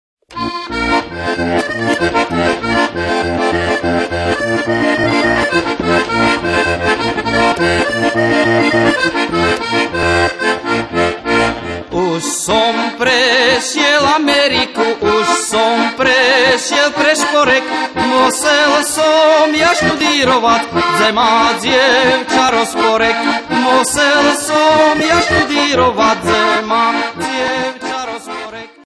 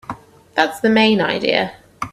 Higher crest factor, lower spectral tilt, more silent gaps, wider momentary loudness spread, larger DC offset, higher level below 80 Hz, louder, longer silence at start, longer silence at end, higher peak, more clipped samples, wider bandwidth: second, 12 dB vs 18 dB; second, -3 dB/octave vs -5 dB/octave; neither; second, 7 LU vs 18 LU; neither; first, -40 dBFS vs -56 dBFS; first, -12 LUFS vs -17 LUFS; first, 0.3 s vs 0.1 s; first, 0.2 s vs 0.05 s; about the same, 0 dBFS vs 0 dBFS; neither; second, 11 kHz vs 14 kHz